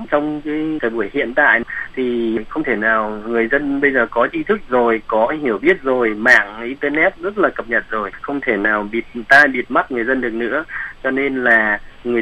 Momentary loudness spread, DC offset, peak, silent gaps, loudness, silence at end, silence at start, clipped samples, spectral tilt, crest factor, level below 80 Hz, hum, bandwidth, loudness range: 10 LU; under 0.1%; 0 dBFS; none; -17 LUFS; 0 s; 0 s; under 0.1%; -5.5 dB/octave; 18 dB; -44 dBFS; none; 12.5 kHz; 2 LU